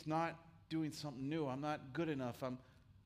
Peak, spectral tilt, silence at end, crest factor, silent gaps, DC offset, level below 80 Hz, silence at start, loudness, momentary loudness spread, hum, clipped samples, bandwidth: -28 dBFS; -6.5 dB/octave; 0.05 s; 16 dB; none; under 0.1%; -74 dBFS; 0 s; -43 LUFS; 6 LU; none; under 0.1%; 15.5 kHz